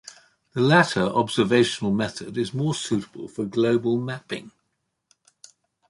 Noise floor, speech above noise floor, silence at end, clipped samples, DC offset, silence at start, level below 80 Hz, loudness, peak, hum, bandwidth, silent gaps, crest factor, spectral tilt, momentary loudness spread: -76 dBFS; 54 dB; 1.4 s; under 0.1%; under 0.1%; 0.05 s; -60 dBFS; -23 LUFS; -2 dBFS; none; 11.5 kHz; none; 22 dB; -5.5 dB/octave; 14 LU